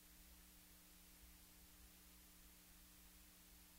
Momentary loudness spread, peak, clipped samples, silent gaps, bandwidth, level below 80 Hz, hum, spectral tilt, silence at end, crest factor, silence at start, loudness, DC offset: 0 LU; -52 dBFS; under 0.1%; none; 16 kHz; -70 dBFS; none; -2.5 dB/octave; 0 s; 14 dB; 0 s; -64 LUFS; under 0.1%